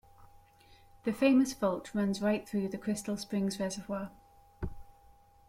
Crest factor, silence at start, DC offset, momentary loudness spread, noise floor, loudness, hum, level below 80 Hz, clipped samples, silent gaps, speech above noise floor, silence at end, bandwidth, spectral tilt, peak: 18 dB; 0.2 s; under 0.1%; 18 LU; -60 dBFS; -32 LUFS; none; -56 dBFS; under 0.1%; none; 29 dB; 0.65 s; 16 kHz; -5.5 dB/octave; -14 dBFS